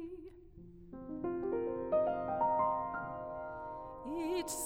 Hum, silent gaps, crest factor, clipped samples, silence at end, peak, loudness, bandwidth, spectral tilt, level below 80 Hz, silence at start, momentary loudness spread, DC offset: none; none; 16 dB; under 0.1%; 0 s; -22 dBFS; -37 LUFS; 17.5 kHz; -5 dB/octave; -60 dBFS; 0 s; 19 LU; under 0.1%